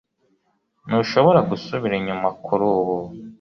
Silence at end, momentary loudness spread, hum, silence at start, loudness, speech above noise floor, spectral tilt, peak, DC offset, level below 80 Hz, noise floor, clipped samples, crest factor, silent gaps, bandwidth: 0.05 s; 9 LU; none; 0.85 s; -20 LUFS; 48 dB; -7.5 dB/octave; -2 dBFS; under 0.1%; -56 dBFS; -68 dBFS; under 0.1%; 20 dB; none; 6.6 kHz